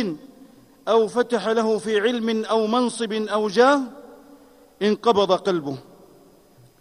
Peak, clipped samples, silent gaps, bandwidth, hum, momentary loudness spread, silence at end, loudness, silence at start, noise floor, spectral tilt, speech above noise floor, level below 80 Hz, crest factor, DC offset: -4 dBFS; under 0.1%; none; 13 kHz; none; 12 LU; 1 s; -21 LUFS; 0 s; -53 dBFS; -4.5 dB/octave; 32 dB; -66 dBFS; 18 dB; under 0.1%